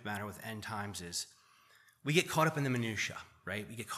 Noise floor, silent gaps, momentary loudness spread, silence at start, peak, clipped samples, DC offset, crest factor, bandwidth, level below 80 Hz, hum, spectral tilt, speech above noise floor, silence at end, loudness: -65 dBFS; none; 12 LU; 0 s; -14 dBFS; under 0.1%; under 0.1%; 22 dB; 15 kHz; -72 dBFS; none; -4 dB/octave; 29 dB; 0 s; -36 LUFS